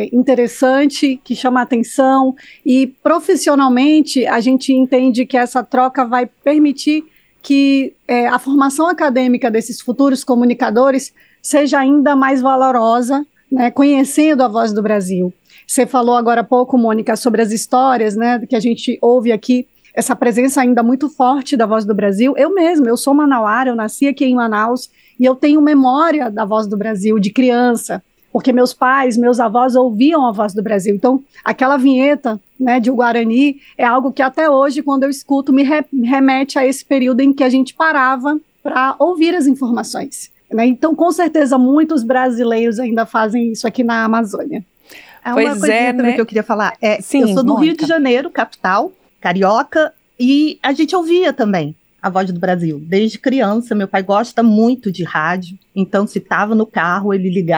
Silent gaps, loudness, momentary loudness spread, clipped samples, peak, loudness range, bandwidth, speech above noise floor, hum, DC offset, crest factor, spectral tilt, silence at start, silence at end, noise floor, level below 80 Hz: none; -14 LUFS; 6 LU; under 0.1%; -2 dBFS; 3 LU; 12.5 kHz; 28 dB; none; under 0.1%; 12 dB; -5 dB/octave; 0 s; 0 s; -41 dBFS; -64 dBFS